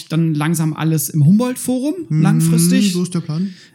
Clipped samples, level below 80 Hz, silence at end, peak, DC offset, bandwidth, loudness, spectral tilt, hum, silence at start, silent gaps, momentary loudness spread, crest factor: under 0.1%; -64 dBFS; 0.2 s; -4 dBFS; under 0.1%; 17 kHz; -16 LUFS; -6 dB/octave; none; 0 s; none; 8 LU; 12 dB